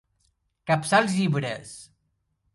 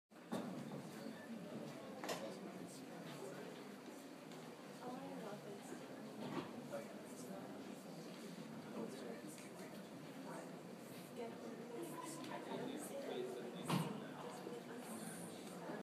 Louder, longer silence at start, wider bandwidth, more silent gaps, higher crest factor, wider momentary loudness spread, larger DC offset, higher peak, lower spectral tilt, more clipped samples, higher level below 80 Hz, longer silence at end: first, -24 LUFS vs -50 LUFS; first, 0.65 s vs 0.1 s; second, 11.5 kHz vs 15.5 kHz; neither; about the same, 22 dB vs 22 dB; first, 20 LU vs 7 LU; neither; first, -6 dBFS vs -28 dBFS; about the same, -5 dB/octave vs -5 dB/octave; neither; first, -64 dBFS vs under -90 dBFS; first, 0.7 s vs 0 s